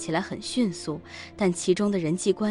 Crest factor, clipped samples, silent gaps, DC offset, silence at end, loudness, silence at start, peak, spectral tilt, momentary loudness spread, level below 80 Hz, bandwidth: 16 dB; under 0.1%; none; under 0.1%; 0 s; -27 LUFS; 0 s; -10 dBFS; -5 dB/octave; 11 LU; -62 dBFS; 11.5 kHz